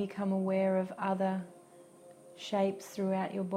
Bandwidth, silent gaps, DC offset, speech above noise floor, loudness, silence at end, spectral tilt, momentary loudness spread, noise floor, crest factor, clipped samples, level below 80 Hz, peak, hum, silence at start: 14 kHz; none; under 0.1%; 24 dB; -33 LUFS; 0 s; -7 dB/octave; 8 LU; -56 dBFS; 14 dB; under 0.1%; -80 dBFS; -18 dBFS; none; 0 s